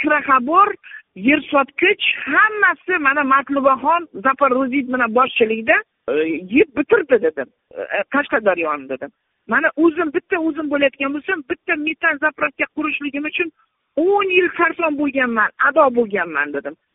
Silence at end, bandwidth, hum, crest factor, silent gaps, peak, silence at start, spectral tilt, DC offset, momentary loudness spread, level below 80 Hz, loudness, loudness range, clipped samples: 0.2 s; 3.9 kHz; none; 18 dB; none; 0 dBFS; 0 s; -1.5 dB/octave; under 0.1%; 8 LU; -58 dBFS; -17 LUFS; 4 LU; under 0.1%